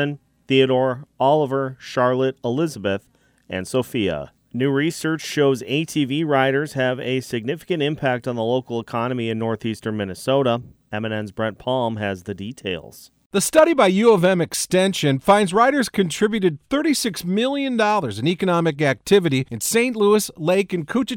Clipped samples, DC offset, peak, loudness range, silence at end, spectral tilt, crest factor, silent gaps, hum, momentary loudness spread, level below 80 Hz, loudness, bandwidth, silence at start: under 0.1%; under 0.1%; -4 dBFS; 7 LU; 0 s; -5 dB/octave; 16 dB; 13.26-13.30 s; none; 10 LU; -56 dBFS; -20 LUFS; 18 kHz; 0 s